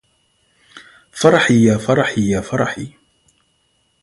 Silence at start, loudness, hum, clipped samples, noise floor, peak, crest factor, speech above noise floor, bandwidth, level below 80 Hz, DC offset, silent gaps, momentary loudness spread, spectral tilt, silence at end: 0.75 s; -15 LUFS; none; under 0.1%; -63 dBFS; 0 dBFS; 18 dB; 48 dB; 11.5 kHz; -48 dBFS; under 0.1%; none; 18 LU; -5.5 dB/octave; 1.15 s